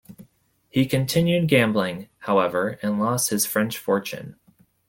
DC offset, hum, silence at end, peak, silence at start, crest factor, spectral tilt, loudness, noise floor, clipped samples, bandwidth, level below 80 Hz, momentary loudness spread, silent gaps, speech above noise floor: under 0.1%; none; 0.6 s; -4 dBFS; 0.1 s; 20 dB; -4.5 dB/octave; -22 LUFS; -60 dBFS; under 0.1%; 17 kHz; -58 dBFS; 11 LU; none; 38 dB